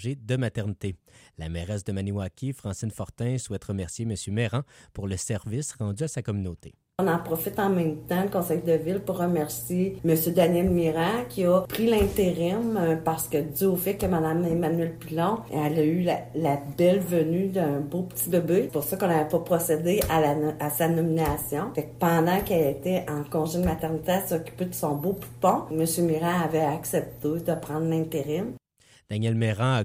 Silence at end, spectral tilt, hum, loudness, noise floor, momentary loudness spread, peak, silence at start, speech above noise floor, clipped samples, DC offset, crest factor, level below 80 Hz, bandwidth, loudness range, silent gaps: 0 s; -6 dB/octave; none; -26 LUFS; -60 dBFS; 9 LU; -10 dBFS; 0 s; 34 dB; under 0.1%; under 0.1%; 16 dB; -48 dBFS; 16 kHz; 7 LU; none